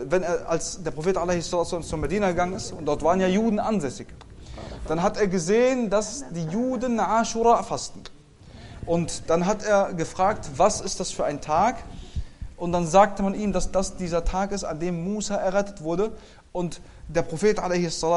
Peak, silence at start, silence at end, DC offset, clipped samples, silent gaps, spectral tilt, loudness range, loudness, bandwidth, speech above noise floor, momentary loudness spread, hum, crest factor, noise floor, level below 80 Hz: -4 dBFS; 0 s; 0 s; under 0.1%; under 0.1%; none; -5 dB/octave; 3 LU; -25 LUFS; 11.5 kHz; 23 dB; 15 LU; none; 20 dB; -47 dBFS; -40 dBFS